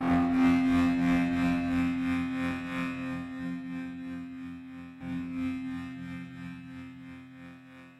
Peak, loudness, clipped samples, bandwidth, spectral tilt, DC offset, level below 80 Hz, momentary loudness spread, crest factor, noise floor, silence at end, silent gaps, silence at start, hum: -18 dBFS; -30 LUFS; under 0.1%; 10.5 kHz; -7 dB/octave; under 0.1%; -54 dBFS; 20 LU; 14 dB; -50 dBFS; 0.05 s; none; 0 s; none